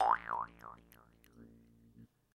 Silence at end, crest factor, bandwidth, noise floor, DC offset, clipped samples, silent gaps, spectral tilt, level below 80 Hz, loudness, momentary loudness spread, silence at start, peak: 0.3 s; 24 dB; 15 kHz; -63 dBFS; under 0.1%; under 0.1%; none; -5 dB/octave; -68 dBFS; -37 LUFS; 27 LU; 0 s; -16 dBFS